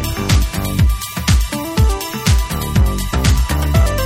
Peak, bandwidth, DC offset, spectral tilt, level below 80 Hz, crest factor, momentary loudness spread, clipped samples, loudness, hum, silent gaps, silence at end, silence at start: -2 dBFS; 17 kHz; under 0.1%; -5 dB/octave; -18 dBFS; 14 dB; 3 LU; under 0.1%; -16 LUFS; none; none; 0 s; 0 s